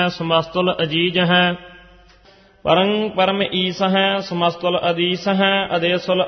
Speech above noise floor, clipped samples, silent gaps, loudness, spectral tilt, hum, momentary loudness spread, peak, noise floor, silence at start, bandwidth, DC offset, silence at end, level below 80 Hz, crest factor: 32 dB; under 0.1%; none; -18 LUFS; -6 dB/octave; none; 4 LU; -2 dBFS; -50 dBFS; 0 s; 6.4 kHz; under 0.1%; 0 s; -54 dBFS; 18 dB